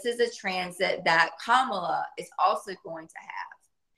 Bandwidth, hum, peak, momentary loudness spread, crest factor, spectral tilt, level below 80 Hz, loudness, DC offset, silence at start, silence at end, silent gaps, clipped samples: 12.5 kHz; none; -6 dBFS; 17 LU; 22 dB; -3 dB/octave; -74 dBFS; -26 LUFS; under 0.1%; 0 s; 0.5 s; none; under 0.1%